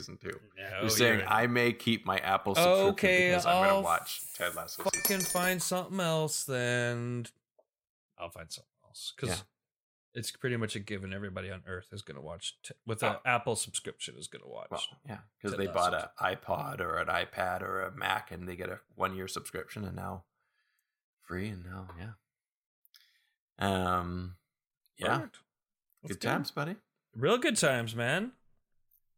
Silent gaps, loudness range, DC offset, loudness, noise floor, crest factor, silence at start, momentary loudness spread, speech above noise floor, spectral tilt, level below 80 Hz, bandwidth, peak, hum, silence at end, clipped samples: 7.89-8.09 s, 9.80-10.12 s, 21.04-21.17 s, 22.57-22.83 s, 23.40-23.56 s, 24.77-24.81 s; 13 LU; under 0.1%; -31 LUFS; -82 dBFS; 22 dB; 0 s; 19 LU; 50 dB; -3.5 dB/octave; -64 dBFS; 17 kHz; -10 dBFS; none; 0.85 s; under 0.1%